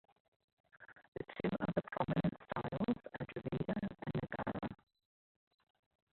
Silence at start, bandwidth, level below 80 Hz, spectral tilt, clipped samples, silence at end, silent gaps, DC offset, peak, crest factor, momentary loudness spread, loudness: 0.8 s; 4.4 kHz; -64 dBFS; -6.5 dB/octave; under 0.1%; 1.4 s; 1.08-1.12 s; under 0.1%; -20 dBFS; 22 dB; 12 LU; -41 LUFS